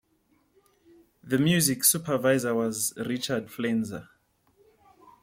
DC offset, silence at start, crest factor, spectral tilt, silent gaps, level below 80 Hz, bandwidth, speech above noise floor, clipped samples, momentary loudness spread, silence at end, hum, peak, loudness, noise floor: under 0.1%; 1.25 s; 24 dB; -4 dB/octave; none; -66 dBFS; 16.5 kHz; 42 dB; under 0.1%; 10 LU; 1.2 s; none; -4 dBFS; -25 LUFS; -68 dBFS